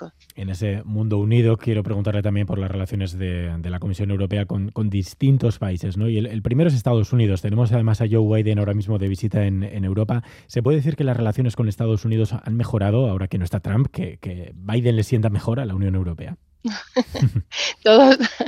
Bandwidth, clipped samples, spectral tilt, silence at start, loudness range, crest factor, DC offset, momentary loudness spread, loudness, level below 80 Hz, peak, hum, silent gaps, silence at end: 11.5 kHz; under 0.1%; -7.5 dB/octave; 0 s; 4 LU; 20 dB; under 0.1%; 9 LU; -21 LUFS; -48 dBFS; 0 dBFS; none; none; 0 s